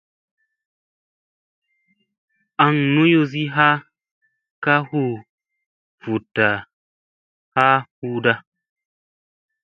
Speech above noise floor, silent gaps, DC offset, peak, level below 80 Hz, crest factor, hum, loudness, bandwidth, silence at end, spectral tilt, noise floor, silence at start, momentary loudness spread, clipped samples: 50 dB; 4.11-4.21 s, 4.51-4.62 s, 5.29-5.38 s, 5.66-5.98 s, 6.73-7.52 s, 7.91-8.02 s; under 0.1%; 0 dBFS; -64 dBFS; 22 dB; none; -19 LUFS; 6.6 kHz; 1.25 s; -8 dB/octave; -68 dBFS; 2.6 s; 11 LU; under 0.1%